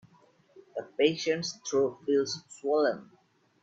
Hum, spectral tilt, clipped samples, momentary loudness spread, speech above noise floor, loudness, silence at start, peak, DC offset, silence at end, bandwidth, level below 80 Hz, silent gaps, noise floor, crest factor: none; -4 dB/octave; under 0.1%; 13 LU; 34 dB; -29 LUFS; 0.55 s; -10 dBFS; under 0.1%; 0.6 s; 8 kHz; -76 dBFS; none; -63 dBFS; 20 dB